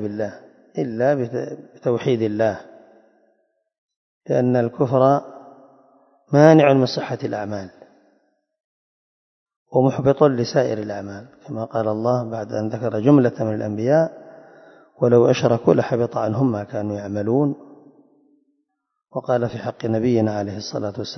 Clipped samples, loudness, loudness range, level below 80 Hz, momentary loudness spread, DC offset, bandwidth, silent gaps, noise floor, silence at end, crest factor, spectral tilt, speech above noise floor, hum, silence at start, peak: under 0.1%; -20 LUFS; 7 LU; -62 dBFS; 15 LU; under 0.1%; 6.4 kHz; 3.78-3.89 s, 3.96-4.21 s, 8.60-9.46 s, 9.56-9.66 s; -77 dBFS; 0 s; 20 dB; -7.5 dB/octave; 58 dB; none; 0 s; 0 dBFS